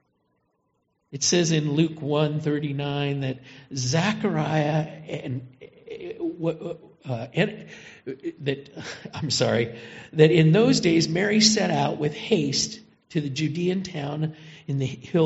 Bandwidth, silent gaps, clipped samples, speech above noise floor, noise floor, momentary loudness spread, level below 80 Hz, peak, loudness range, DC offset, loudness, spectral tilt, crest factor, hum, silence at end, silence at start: 8 kHz; none; under 0.1%; 48 dB; -72 dBFS; 19 LU; -62 dBFS; -2 dBFS; 10 LU; under 0.1%; -24 LUFS; -5 dB/octave; 22 dB; none; 0 s; 1.1 s